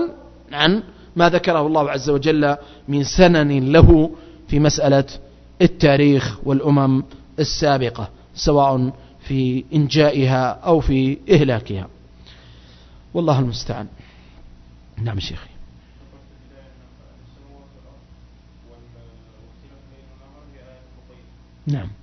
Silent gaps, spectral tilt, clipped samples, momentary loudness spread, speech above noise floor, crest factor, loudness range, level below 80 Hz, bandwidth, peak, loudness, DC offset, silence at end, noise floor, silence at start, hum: none; -6.5 dB/octave; under 0.1%; 16 LU; 30 dB; 18 dB; 18 LU; -32 dBFS; 6.4 kHz; 0 dBFS; -18 LUFS; under 0.1%; 0.1 s; -46 dBFS; 0 s; 60 Hz at -45 dBFS